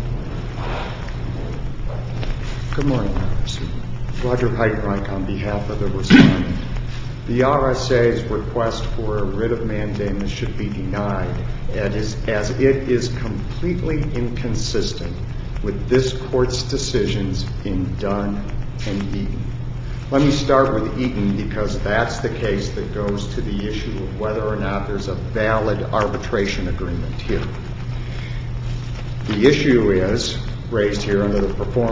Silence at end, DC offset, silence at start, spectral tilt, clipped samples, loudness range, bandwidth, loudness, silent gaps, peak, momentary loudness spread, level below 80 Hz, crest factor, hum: 0 s; under 0.1%; 0 s; -6.5 dB/octave; under 0.1%; 6 LU; 7.8 kHz; -21 LUFS; none; 0 dBFS; 11 LU; -28 dBFS; 20 dB; none